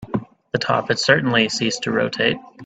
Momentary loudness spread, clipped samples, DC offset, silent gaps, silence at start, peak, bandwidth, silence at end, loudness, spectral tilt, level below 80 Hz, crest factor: 11 LU; under 0.1%; under 0.1%; none; 0 s; 0 dBFS; 9.2 kHz; 0 s; -19 LUFS; -4 dB/octave; -56 dBFS; 20 dB